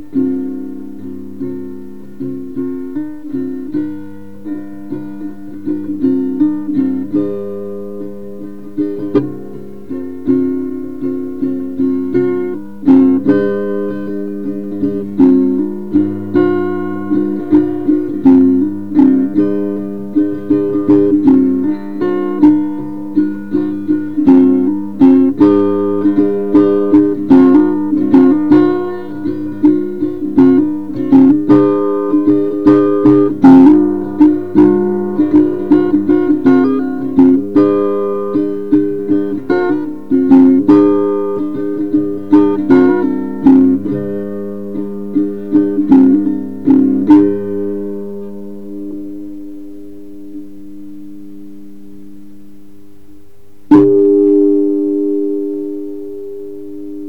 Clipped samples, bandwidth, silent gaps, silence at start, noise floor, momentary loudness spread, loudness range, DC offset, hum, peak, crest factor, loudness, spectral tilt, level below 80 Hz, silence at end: 0.1%; 4.5 kHz; none; 0 s; -46 dBFS; 18 LU; 12 LU; 3%; none; 0 dBFS; 12 dB; -12 LUFS; -10 dB/octave; -50 dBFS; 0 s